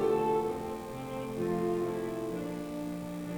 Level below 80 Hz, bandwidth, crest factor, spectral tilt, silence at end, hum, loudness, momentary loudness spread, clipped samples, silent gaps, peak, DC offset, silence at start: -58 dBFS; over 20 kHz; 16 dB; -7 dB/octave; 0 s; 60 Hz at -55 dBFS; -34 LUFS; 9 LU; under 0.1%; none; -18 dBFS; under 0.1%; 0 s